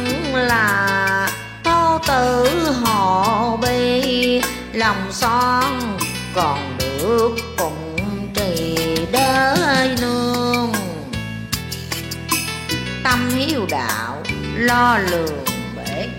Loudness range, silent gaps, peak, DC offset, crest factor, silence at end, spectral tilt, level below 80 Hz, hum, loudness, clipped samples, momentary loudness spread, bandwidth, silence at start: 4 LU; none; -2 dBFS; under 0.1%; 16 dB; 0 s; -4 dB/octave; -40 dBFS; none; -18 LUFS; under 0.1%; 9 LU; 16.5 kHz; 0 s